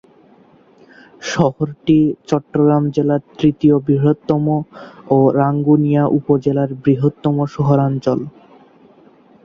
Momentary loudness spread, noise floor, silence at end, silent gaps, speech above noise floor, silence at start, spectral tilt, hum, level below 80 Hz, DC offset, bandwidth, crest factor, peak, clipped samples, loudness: 7 LU; -49 dBFS; 1.15 s; none; 34 dB; 1.2 s; -8.5 dB/octave; none; -52 dBFS; under 0.1%; 7.4 kHz; 14 dB; -2 dBFS; under 0.1%; -16 LUFS